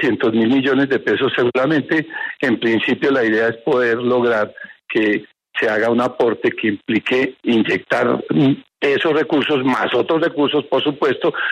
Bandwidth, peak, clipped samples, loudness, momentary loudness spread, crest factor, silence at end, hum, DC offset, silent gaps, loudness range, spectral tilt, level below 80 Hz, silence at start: 9.6 kHz; -4 dBFS; under 0.1%; -17 LUFS; 4 LU; 12 dB; 0 s; none; under 0.1%; none; 1 LU; -6.5 dB/octave; -62 dBFS; 0 s